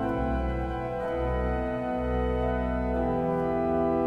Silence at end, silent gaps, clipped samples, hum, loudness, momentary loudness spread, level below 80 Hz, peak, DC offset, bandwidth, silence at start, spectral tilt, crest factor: 0 s; none; under 0.1%; none; -29 LUFS; 4 LU; -34 dBFS; -14 dBFS; under 0.1%; 5.2 kHz; 0 s; -9 dB/octave; 14 dB